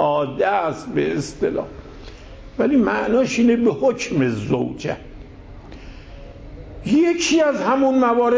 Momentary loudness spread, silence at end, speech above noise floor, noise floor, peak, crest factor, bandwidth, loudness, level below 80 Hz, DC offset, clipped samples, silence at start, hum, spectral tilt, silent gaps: 23 LU; 0 s; 20 dB; -39 dBFS; -6 dBFS; 14 dB; 8 kHz; -19 LUFS; -44 dBFS; under 0.1%; under 0.1%; 0 s; none; -5.5 dB/octave; none